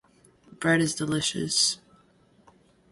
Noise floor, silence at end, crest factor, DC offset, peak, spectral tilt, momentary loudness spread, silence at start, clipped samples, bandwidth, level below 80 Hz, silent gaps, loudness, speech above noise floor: -61 dBFS; 1.15 s; 20 dB; under 0.1%; -10 dBFS; -3 dB/octave; 6 LU; 0.5 s; under 0.1%; 11.5 kHz; -62 dBFS; none; -25 LUFS; 36 dB